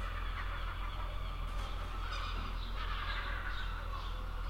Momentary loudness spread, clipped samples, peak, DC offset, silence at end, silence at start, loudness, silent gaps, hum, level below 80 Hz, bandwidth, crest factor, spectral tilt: 4 LU; under 0.1%; -26 dBFS; under 0.1%; 0 s; 0 s; -41 LUFS; none; none; -40 dBFS; 15.5 kHz; 12 dB; -5 dB/octave